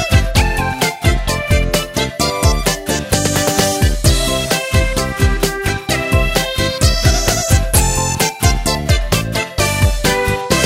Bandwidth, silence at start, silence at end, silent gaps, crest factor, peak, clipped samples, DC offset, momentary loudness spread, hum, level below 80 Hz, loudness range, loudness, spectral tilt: 16.5 kHz; 0 s; 0 s; none; 14 dB; 0 dBFS; under 0.1%; under 0.1%; 4 LU; none; -20 dBFS; 1 LU; -15 LUFS; -4 dB/octave